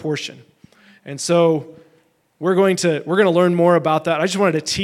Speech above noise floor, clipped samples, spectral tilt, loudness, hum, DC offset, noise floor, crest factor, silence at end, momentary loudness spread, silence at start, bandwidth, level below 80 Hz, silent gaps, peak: 42 dB; under 0.1%; -5 dB/octave; -17 LUFS; none; under 0.1%; -59 dBFS; 16 dB; 0 s; 11 LU; 0 s; 14.5 kHz; -56 dBFS; none; -2 dBFS